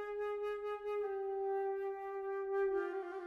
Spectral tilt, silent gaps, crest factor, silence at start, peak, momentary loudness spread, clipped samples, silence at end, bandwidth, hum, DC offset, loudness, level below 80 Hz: -5 dB/octave; none; 12 dB; 0 s; -28 dBFS; 5 LU; under 0.1%; 0 s; 5.8 kHz; none; under 0.1%; -39 LUFS; -74 dBFS